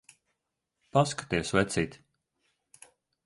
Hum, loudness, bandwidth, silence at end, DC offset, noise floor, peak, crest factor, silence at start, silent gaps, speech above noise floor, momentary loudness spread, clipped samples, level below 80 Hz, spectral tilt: none; -29 LUFS; 11.5 kHz; 1.3 s; under 0.1%; -84 dBFS; -8 dBFS; 24 dB; 0.95 s; none; 56 dB; 5 LU; under 0.1%; -56 dBFS; -5 dB/octave